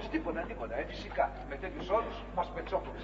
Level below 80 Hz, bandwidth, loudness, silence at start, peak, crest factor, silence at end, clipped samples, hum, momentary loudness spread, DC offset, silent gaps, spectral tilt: -46 dBFS; 7.6 kHz; -36 LUFS; 0 s; -16 dBFS; 20 dB; 0 s; under 0.1%; 50 Hz at -45 dBFS; 6 LU; under 0.1%; none; -4 dB/octave